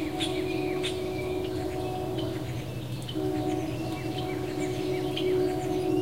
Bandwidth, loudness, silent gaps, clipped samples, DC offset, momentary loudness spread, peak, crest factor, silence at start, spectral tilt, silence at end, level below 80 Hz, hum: 16 kHz; -31 LUFS; none; under 0.1%; 0.4%; 6 LU; -16 dBFS; 14 dB; 0 s; -6 dB/octave; 0 s; -50 dBFS; none